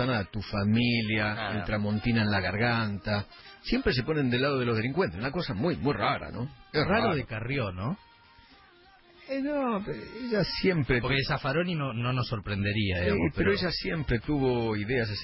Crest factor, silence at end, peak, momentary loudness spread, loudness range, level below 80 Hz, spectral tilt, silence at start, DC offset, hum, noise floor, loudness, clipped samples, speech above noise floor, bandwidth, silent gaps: 16 dB; 0 s; -12 dBFS; 7 LU; 4 LU; -46 dBFS; -10 dB/octave; 0 s; under 0.1%; none; -57 dBFS; -29 LUFS; under 0.1%; 29 dB; 5.8 kHz; none